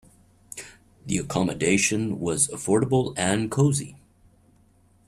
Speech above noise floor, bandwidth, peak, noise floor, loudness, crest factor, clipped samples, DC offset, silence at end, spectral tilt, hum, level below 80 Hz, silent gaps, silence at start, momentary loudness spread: 36 dB; 13.5 kHz; -6 dBFS; -59 dBFS; -24 LUFS; 20 dB; under 0.1%; under 0.1%; 1.1 s; -4.5 dB/octave; none; -54 dBFS; none; 0.55 s; 19 LU